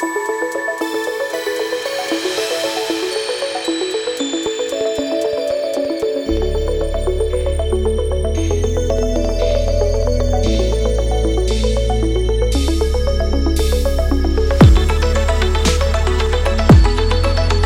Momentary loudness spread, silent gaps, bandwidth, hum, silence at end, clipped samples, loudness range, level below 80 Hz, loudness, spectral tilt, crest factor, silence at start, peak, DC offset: 5 LU; none; 18 kHz; none; 0 s; under 0.1%; 5 LU; -20 dBFS; -17 LUFS; -5.5 dB/octave; 14 dB; 0 s; 0 dBFS; under 0.1%